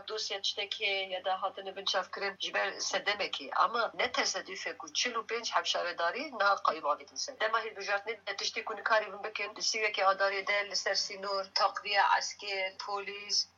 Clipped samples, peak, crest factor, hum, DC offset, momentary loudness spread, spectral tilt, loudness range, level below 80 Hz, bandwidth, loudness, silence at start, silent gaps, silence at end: under 0.1%; -14 dBFS; 20 dB; none; under 0.1%; 8 LU; 0.5 dB/octave; 3 LU; -86 dBFS; 8 kHz; -32 LUFS; 0 s; none; 0.1 s